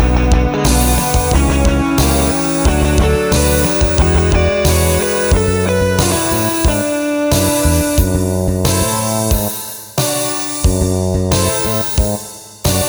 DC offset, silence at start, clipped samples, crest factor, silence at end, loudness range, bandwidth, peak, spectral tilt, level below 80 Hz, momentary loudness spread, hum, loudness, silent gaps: under 0.1%; 0 s; under 0.1%; 14 dB; 0 s; 3 LU; over 20 kHz; 0 dBFS; -4.5 dB/octave; -18 dBFS; 4 LU; none; -14 LUFS; none